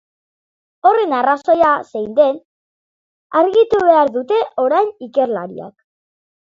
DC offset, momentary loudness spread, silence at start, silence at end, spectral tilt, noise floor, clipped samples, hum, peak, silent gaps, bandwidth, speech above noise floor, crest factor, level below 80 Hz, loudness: under 0.1%; 8 LU; 0.85 s; 0.8 s; -6 dB/octave; under -90 dBFS; under 0.1%; none; 0 dBFS; 2.45-3.30 s; 7.6 kHz; over 75 dB; 16 dB; -58 dBFS; -15 LUFS